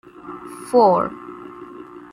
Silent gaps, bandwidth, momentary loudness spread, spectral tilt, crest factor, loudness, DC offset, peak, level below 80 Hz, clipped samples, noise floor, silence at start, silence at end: none; 14.5 kHz; 23 LU; -6.5 dB/octave; 18 dB; -17 LUFS; under 0.1%; -2 dBFS; -62 dBFS; under 0.1%; -38 dBFS; 0.25 s; 0.15 s